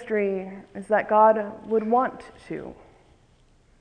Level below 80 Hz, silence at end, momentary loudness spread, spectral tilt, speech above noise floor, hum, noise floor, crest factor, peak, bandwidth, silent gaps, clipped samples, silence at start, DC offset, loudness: -60 dBFS; 1.05 s; 20 LU; -7.5 dB/octave; 35 dB; none; -59 dBFS; 20 dB; -6 dBFS; 9.4 kHz; none; under 0.1%; 0 s; under 0.1%; -23 LUFS